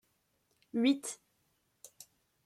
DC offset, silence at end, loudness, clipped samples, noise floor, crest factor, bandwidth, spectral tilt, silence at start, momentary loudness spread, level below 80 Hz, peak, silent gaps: under 0.1%; 1.3 s; -33 LUFS; under 0.1%; -77 dBFS; 20 dB; 14.5 kHz; -3 dB/octave; 0.75 s; 23 LU; -84 dBFS; -18 dBFS; none